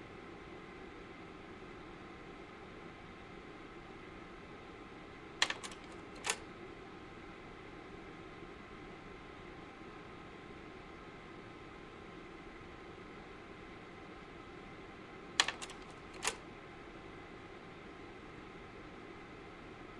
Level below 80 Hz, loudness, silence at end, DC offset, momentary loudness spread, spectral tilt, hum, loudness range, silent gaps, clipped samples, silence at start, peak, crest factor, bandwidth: -64 dBFS; -46 LUFS; 0 s; under 0.1%; 12 LU; -2 dB/octave; none; 10 LU; none; under 0.1%; 0 s; -10 dBFS; 36 dB; 11 kHz